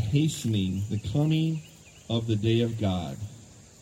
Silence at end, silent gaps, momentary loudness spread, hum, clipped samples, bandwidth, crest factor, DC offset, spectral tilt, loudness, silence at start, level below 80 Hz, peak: 0.2 s; none; 11 LU; none; under 0.1%; 16 kHz; 16 dB; under 0.1%; -6.5 dB/octave; -28 LUFS; 0 s; -54 dBFS; -12 dBFS